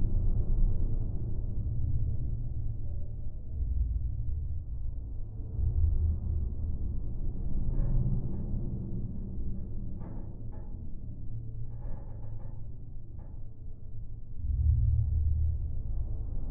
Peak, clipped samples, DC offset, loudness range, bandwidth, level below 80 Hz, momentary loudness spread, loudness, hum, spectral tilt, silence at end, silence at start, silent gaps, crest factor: -14 dBFS; under 0.1%; under 0.1%; 10 LU; 1.3 kHz; -32 dBFS; 14 LU; -35 LUFS; none; -14.5 dB/octave; 0 s; 0 s; none; 14 dB